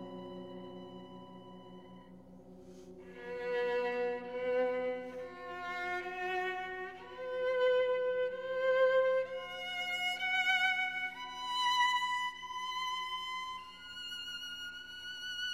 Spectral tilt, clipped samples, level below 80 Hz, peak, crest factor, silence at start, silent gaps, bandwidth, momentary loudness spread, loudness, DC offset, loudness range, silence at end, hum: -2.5 dB/octave; under 0.1%; -74 dBFS; -20 dBFS; 18 dB; 0 s; none; 14 kHz; 22 LU; -35 LUFS; under 0.1%; 8 LU; 0 s; none